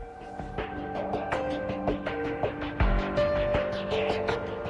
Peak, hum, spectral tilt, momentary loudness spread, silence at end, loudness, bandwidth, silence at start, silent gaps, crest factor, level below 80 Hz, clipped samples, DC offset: -12 dBFS; none; -7 dB/octave; 8 LU; 0 s; -30 LUFS; 10.5 kHz; 0 s; none; 16 dB; -36 dBFS; under 0.1%; under 0.1%